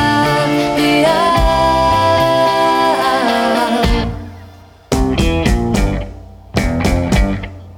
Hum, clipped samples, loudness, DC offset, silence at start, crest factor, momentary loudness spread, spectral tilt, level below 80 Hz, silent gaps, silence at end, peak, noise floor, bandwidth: none; under 0.1%; -14 LUFS; under 0.1%; 0 s; 14 dB; 9 LU; -5.5 dB/octave; -22 dBFS; none; 0 s; 0 dBFS; -38 dBFS; 18 kHz